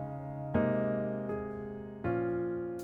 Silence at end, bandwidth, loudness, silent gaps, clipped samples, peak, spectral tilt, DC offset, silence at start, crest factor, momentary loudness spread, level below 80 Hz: 0 s; 9.6 kHz; -35 LUFS; none; under 0.1%; -18 dBFS; -9.5 dB/octave; under 0.1%; 0 s; 16 dB; 10 LU; -56 dBFS